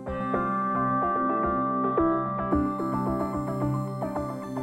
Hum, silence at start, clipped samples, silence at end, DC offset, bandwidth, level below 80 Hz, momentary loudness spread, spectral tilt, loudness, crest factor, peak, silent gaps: none; 0 s; under 0.1%; 0 s; under 0.1%; 13 kHz; -48 dBFS; 6 LU; -9 dB/octave; -27 LUFS; 16 dB; -12 dBFS; none